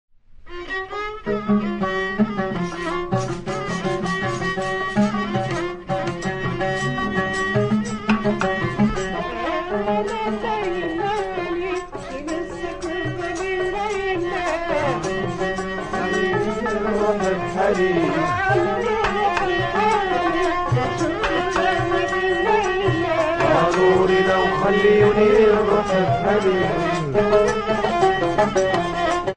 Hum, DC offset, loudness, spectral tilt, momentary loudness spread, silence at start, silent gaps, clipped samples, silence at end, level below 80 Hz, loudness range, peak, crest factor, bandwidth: none; under 0.1%; -21 LUFS; -6 dB/octave; 9 LU; 0.35 s; none; under 0.1%; 0 s; -40 dBFS; 7 LU; -4 dBFS; 16 dB; 10 kHz